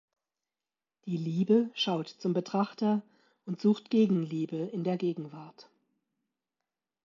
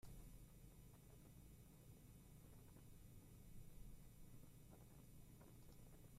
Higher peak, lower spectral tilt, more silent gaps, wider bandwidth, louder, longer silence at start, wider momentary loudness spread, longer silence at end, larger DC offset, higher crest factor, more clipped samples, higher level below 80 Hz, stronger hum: first, -14 dBFS vs -48 dBFS; first, -7.5 dB/octave vs -5.5 dB/octave; neither; second, 7.4 kHz vs 15.5 kHz; first, -30 LUFS vs -66 LUFS; first, 1.05 s vs 0 s; first, 14 LU vs 2 LU; first, 1.45 s vs 0 s; neither; about the same, 18 dB vs 14 dB; neither; second, -84 dBFS vs -68 dBFS; second, none vs 50 Hz at -70 dBFS